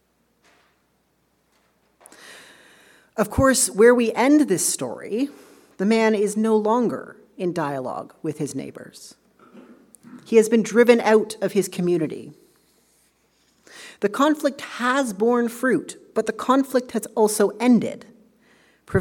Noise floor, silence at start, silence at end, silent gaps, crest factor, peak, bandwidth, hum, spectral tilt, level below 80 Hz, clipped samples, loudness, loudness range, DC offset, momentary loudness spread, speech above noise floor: -66 dBFS; 2.25 s; 0 s; none; 22 dB; -2 dBFS; 18 kHz; none; -4.5 dB/octave; -54 dBFS; under 0.1%; -21 LUFS; 7 LU; under 0.1%; 15 LU; 46 dB